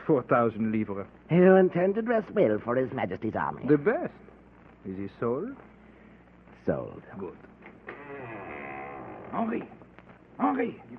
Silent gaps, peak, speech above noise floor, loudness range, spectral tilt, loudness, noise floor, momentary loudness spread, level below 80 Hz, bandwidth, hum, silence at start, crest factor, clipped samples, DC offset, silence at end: none; -8 dBFS; 27 dB; 14 LU; -11 dB/octave; -27 LUFS; -54 dBFS; 19 LU; -62 dBFS; 4.2 kHz; 60 Hz at -60 dBFS; 0 s; 22 dB; under 0.1%; under 0.1%; 0 s